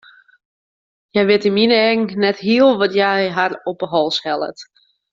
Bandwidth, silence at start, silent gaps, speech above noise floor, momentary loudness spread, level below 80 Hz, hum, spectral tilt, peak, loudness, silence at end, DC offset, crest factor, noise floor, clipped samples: 7.6 kHz; 1.15 s; none; over 74 dB; 9 LU; -62 dBFS; none; -5.5 dB/octave; -2 dBFS; -16 LUFS; 0.5 s; under 0.1%; 16 dB; under -90 dBFS; under 0.1%